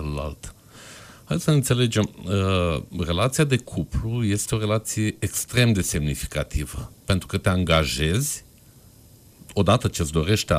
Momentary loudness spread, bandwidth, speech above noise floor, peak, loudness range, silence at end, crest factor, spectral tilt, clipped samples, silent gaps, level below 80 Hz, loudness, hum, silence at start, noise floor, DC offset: 13 LU; 15.5 kHz; 28 dB; -6 dBFS; 2 LU; 0 s; 18 dB; -5 dB/octave; under 0.1%; none; -38 dBFS; -23 LUFS; none; 0 s; -51 dBFS; under 0.1%